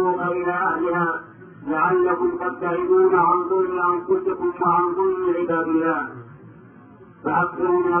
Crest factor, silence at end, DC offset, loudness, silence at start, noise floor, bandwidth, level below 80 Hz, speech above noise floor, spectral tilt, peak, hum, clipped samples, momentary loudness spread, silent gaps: 16 dB; 0 s; under 0.1%; -21 LUFS; 0 s; -46 dBFS; 3.4 kHz; -60 dBFS; 26 dB; -12 dB/octave; -6 dBFS; none; under 0.1%; 8 LU; none